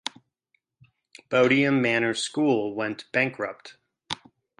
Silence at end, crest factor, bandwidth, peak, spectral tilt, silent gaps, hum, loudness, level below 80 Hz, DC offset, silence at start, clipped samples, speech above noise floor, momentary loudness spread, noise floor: 0.45 s; 18 dB; 11 kHz; -8 dBFS; -4.5 dB/octave; none; none; -24 LUFS; -70 dBFS; under 0.1%; 1.3 s; under 0.1%; 49 dB; 16 LU; -74 dBFS